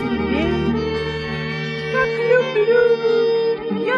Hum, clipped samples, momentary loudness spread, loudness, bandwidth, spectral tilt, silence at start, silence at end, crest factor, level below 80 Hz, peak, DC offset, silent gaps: none; under 0.1%; 9 LU; -19 LUFS; 7.4 kHz; -7 dB/octave; 0 s; 0 s; 14 dB; -42 dBFS; -4 dBFS; under 0.1%; none